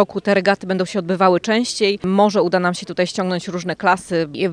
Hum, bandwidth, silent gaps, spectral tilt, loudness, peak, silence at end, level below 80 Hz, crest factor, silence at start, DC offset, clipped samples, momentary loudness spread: none; 10.5 kHz; none; -5 dB/octave; -18 LUFS; 0 dBFS; 0 s; -58 dBFS; 18 dB; 0 s; under 0.1%; under 0.1%; 7 LU